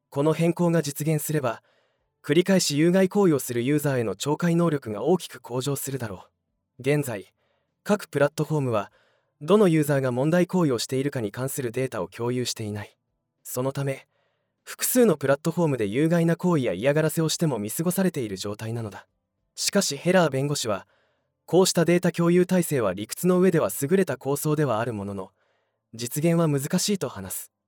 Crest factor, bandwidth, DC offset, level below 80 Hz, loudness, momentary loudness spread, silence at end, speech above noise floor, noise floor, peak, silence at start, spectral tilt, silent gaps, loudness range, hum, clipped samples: 18 dB; over 20 kHz; under 0.1%; -70 dBFS; -24 LUFS; 13 LU; 0.2 s; 49 dB; -72 dBFS; -6 dBFS; 0.1 s; -5.5 dB/octave; none; 5 LU; none; under 0.1%